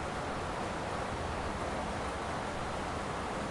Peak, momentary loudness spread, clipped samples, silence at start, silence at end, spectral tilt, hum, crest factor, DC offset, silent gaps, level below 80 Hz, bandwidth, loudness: -24 dBFS; 1 LU; under 0.1%; 0 s; 0 s; -5 dB/octave; none; 14 dB; under 0.1%; none; -48 dBFS; 11.5 kHz; -37 LUFS